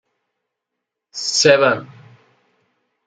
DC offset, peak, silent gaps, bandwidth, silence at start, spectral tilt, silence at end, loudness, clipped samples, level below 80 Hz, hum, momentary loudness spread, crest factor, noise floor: under 0.1%; 0 dBFS; none; 9.4 kHz; 1.15 s; -2.5 dB/octave; 1.2 s; -15 LUFS; under 0.1%; -68 dBFS; none; 14 LU; 20 dB; -81 dBFS